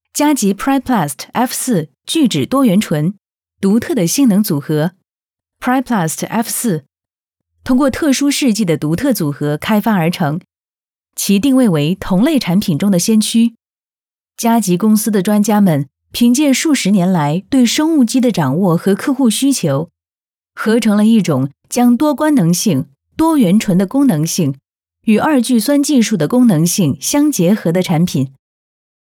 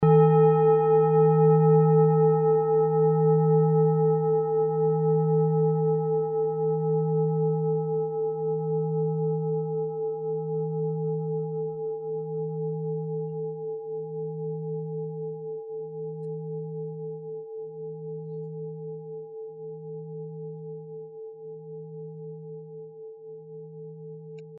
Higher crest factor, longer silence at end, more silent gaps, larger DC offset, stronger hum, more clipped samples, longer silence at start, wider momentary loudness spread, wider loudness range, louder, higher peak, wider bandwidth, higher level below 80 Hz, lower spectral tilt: about the same, 12 dB vs 16 dB; first, 0.75 s vs 0 s; first, 10.84-10.88 s vs none; neither; neither; neither; first, 0.15 s vs 0 s; second, 7 LU vs 21 LU; second, 3 LU vs 19 LU; first, -14 LUFS vs -25 LUFS; first, -2 dBFS vs -8 dBFS; first, 19 kHz vs 3.3 kHz; first, -48 dBFS vs -72 dBFS; second, -5 dB/octave vs -9 dB/octave